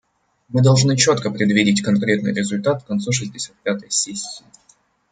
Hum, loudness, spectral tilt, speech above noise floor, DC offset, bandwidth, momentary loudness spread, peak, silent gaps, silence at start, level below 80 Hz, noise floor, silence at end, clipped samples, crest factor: none; -18 LUFS; -4.5 dB/octave; 39 dB; under 0.1%; 9.6 kHz; 12 LU; -2 dBFS; none; 0.5 s; -58 dBFS; -58 dBFS; 0.75 s; under 0.1%; 18 dB